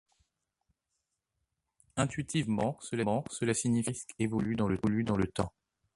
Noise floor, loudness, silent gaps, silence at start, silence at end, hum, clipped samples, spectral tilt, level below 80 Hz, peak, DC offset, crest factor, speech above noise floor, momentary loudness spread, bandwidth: -84 dBFS; -32 LUFS; none; 1.95 s; 0.45 s; none; under 0.1%; -5.5 dB/octave; -56 dBFS; -14 dBFS; under 0.1%; 20 dB; 53 dB; 6 LU; 11.5 kHz